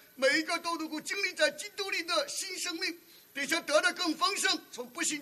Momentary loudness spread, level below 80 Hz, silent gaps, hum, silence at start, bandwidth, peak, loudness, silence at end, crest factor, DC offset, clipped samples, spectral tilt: 9 LU; -84 dBFS; none; none; 0.15 s; 13.5 kHz; -14 dBFS; -30 LUFS; 0 s; 20 dB; under 0.1%; under 0.1%; 0 dB/octave